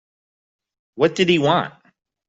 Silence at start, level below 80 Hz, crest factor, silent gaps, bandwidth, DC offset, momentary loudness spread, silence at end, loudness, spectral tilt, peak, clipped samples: 0.95 s; -62 dBFS; 18 dB; none; 7.8 kHz; under 0.1%; 7 LU; 0.6 s; -18 LUFS; -5.5 dB/octave; -4 dBFS; under 0.1%